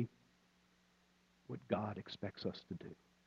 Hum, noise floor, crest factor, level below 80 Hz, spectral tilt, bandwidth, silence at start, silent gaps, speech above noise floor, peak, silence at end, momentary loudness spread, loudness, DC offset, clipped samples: none; -74 dBFS; 26 dB; -78 dBFS; -7.5 dB/octave; 7.8 kHz; 0 s; none; 29 dB; -22 dBFS; 0.35 s; 12 LU; -45 LUFS; under 0.1%; under 0.1%